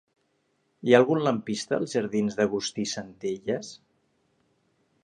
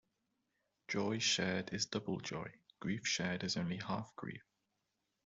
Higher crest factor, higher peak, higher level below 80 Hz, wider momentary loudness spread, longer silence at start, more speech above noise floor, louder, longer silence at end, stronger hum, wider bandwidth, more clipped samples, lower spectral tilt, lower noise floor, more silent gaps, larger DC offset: about the same, 24 dB vs 20 dB; first, -4 dBFS vs -22 dBFS; first, -68 dBFS vs -74 dBFS; about the same, 13 LU vs 14 LU; about the same, 0.85 s vs 0.9 s; about the same, 46 dB vs 47 dB; first, -26 LUFS vs -38 LUFS; first, 1.3 s vs 0.85 s; neither; first, 10.5 kHz vs 8.2 kHz; neither; first, -5 dB/octave vs -3.5 dB/octave; second, -72 dBFS vs -86 dBFS; neither; neither